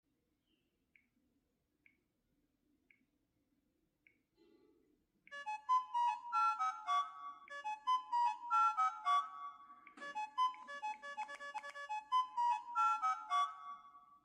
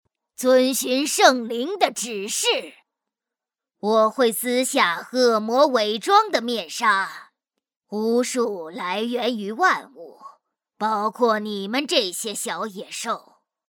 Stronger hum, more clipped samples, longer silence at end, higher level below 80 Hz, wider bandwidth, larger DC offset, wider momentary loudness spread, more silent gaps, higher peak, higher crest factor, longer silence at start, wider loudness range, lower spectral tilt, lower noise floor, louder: neither; neither; second, 0.25 s vs 0.5 s; second, under -90 dBFS vs -80 dBFS; second, 11 kHz vs over 20 kHz; neither; first, 16 LU vs 10 LU; neither; second, -26 dBFS vs 0 dBFS; second, 16 dB vs 22 dB; first, 5.3 s vs 0.4 s; about the same, 6 LU vs 5 LU; second, 0.5 dB/octave vs -2 dB/octave; second, -83 dBFS vs -88 dBFS; second, -38 LUFS vs -21 LUFS